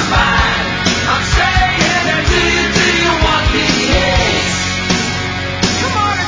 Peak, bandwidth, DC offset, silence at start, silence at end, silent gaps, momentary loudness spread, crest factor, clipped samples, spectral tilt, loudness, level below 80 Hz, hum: 0 dBFS; 7.8 kHz; under 0.1%; 0 s; 0 s; none; 4 LU; 14 dB; under 0.1%; -3.5 dB/octave; -12 LUFS; -22 dBFS; none